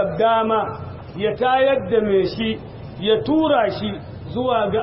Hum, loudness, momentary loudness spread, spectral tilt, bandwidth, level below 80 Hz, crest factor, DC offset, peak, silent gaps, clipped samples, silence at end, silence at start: none; -20 LUFS; 13 LU; -10.5 dB/octave; 5.8 kHz; -46 dBFS; 14 dB; under 0.1%; -6 dBFS; none; under 0.1%; 0 s; 0 s